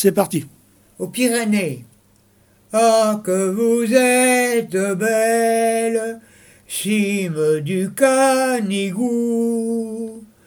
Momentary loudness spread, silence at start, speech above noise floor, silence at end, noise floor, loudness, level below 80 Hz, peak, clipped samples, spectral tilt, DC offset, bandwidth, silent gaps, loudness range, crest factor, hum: 12 LU; 0 s; 38 dB; 0.2 s; -55 dBFS; -18 LUFS; -66 dBFS; 0 dBFS; under 0.1%; -4.5 dB/octave; under 0.1%; over 20 kHz; none; 3 LU; 18 dB; none